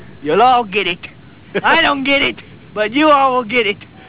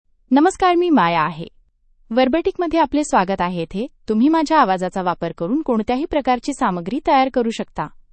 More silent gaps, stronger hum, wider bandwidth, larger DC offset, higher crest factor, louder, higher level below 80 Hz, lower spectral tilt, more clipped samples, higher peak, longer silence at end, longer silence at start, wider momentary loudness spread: neither; neither; second, 4 kHz vs 8.8 kHz; first, 0.7% vs under 0.1%; about the same, 16 dB vs 16 dB; first, -14 LUFS vs -18 LUFS; about the same, -48 dBFS vs -46 dBFS; first, -7.5 dB/octave vs -5.5 dB/octave; neither; about the same, 0 dBFS vs -2 dBFS; second, 0.05 s vs 0.25 s; second, 0 s vs 0.3 s; first, 14 LU vs 10 LU